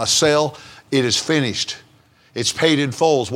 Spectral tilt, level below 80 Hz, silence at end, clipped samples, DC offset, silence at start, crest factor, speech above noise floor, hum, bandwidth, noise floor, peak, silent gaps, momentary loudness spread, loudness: -3.5 dB/octave; -56 dBFS; 0 s; under 0.1%; under 0.1%; 0 s; 18 dB; 35 dB; none; 16.5 kHz; -53 dBFS; 0 dBFS; none; 10 LU; -18 LUFS